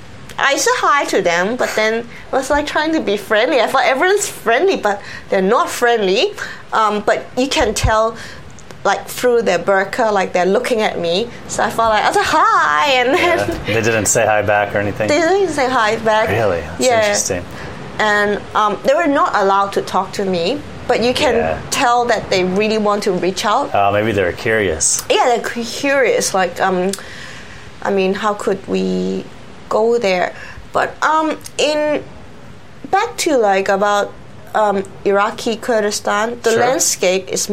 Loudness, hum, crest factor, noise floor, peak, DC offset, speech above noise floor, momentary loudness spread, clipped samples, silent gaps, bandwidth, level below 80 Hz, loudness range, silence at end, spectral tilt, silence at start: -15 LUFS; none; 16 dB; -39 dBFS; 0 dBFS; 1%; 23 dB; 7 LU; under 0.1%; none; 16 kHz; -40 dBFS; 4 LU; 0 s; -3.5 dB/octave; 0 s